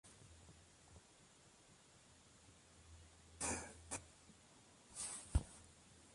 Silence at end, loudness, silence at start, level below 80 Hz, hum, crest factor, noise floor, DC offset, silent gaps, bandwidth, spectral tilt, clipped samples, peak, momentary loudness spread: 0 s; -46 LUFS; 0.05 s; -56 dBFS; none; 28 dB; -67 dBFS; under 0.1%; none; 11.5 kHz; -3.5 dB/octave; under 0.1%; -24 dBFS; 22 LU